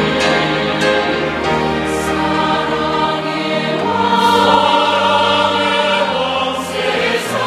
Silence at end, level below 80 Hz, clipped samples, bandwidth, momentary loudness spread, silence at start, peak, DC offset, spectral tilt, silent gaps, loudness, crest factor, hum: 0 s; -42 dBFS; under 0.1%; 15.5 kHz; 6 LU; 0 s; 0 dBFS; under 0.1%; -4 dB/octave; none; -14 LUFS; 14 dB; none